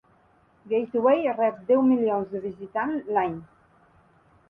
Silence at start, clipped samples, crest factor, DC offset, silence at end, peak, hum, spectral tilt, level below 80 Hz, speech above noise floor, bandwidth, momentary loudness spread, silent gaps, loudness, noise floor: 0.65 s; under 0.1%; 16 dB; under 0.1%; 1.05 s; -10 dBFS; none; -9.5 dB/octave; -66 dBFS; 37 dB; 3.6 kHz; 11 LU; none; -25 LUFS; -61 dBFS